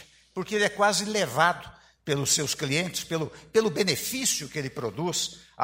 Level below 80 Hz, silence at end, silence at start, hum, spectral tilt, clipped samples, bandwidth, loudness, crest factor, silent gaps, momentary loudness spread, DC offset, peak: -60 dBFS; 0 s; 0 s; none; -3 dB/octave; under 0.1%; 16 kHz; -26 LUFS; 20 dB; none; 10 LU; under 0.1%; -6 dBFS